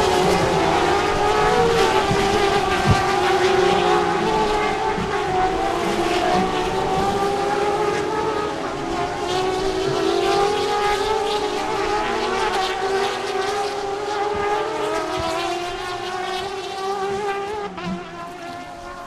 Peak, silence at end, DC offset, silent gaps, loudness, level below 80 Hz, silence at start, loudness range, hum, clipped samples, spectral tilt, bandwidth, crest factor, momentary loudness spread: -4 dBFS; 0 s; under 0.1%; none; -21 LUFS; -40 dBFS; 0 s; 6 LU; none; under 0.1%; -4.5 dB/octave; 14.5 kHz; 16 dB; 9 LU